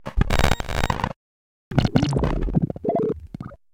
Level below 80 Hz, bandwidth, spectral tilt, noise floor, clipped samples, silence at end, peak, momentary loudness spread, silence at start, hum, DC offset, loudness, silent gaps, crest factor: -28 dBFS; 17 kHz; -6 dB/octave; under -90 dBFS; under 0.1%; 0.2 s; 0 dBFS; 11 LU; 0 s; none; under 0.1%; -24 LUFS; 1.16-1.71 s; 22 dB